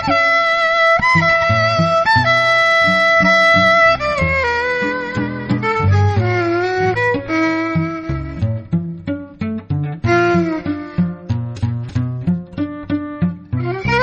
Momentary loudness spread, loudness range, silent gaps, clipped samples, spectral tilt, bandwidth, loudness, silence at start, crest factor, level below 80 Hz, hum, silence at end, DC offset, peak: 12 LU; 8 LU; none; under 0.1%; -6 dB/octave; 9.6 kHz; -15 LUFS; 0 s; 14 dB; -40 dBFS; none; 0 s; under 0.1%; -2 dBFS